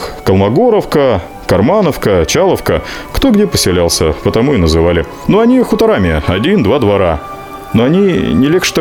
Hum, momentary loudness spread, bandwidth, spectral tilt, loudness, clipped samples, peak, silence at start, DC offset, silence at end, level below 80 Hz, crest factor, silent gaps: none; 6 LU; 18.5 kHz; -5.5 dB/octave; -11 LUFS; under 0.1%; 0 dBFS; 0 s; 0.2%; 0 s; -30 dBFS; 10 dB; none